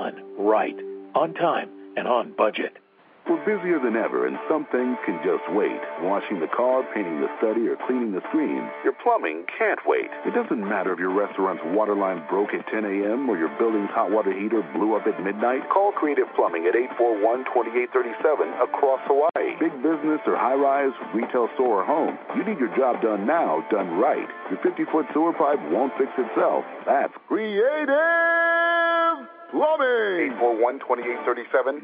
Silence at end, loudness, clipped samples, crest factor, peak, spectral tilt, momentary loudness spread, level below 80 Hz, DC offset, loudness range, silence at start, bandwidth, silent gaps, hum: 0 s; -23 LUFS; under 0.1%; 16 dB; -6 dBFS; -3.5 dB/octave; 6 LU; -88 dBFS; under 0.1%; 4 LU; 0 s; 4.9 kHz; none; none